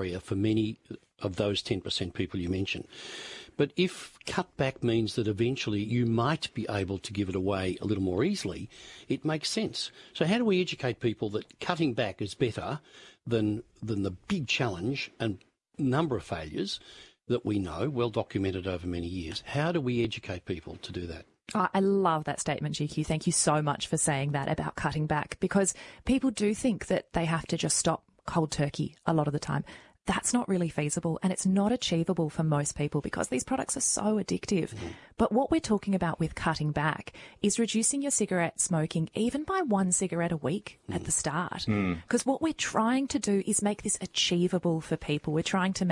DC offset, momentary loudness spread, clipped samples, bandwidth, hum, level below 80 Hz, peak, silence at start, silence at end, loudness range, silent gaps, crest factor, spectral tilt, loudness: under 0.1%; 10 LU; under 0.1%; 11.5 kHz; none; -56 dBFS; -10 dBFS; 0 s; 0 s; 4 LU; none; 20 dB; -4.5 dB/octave; -30 LUFS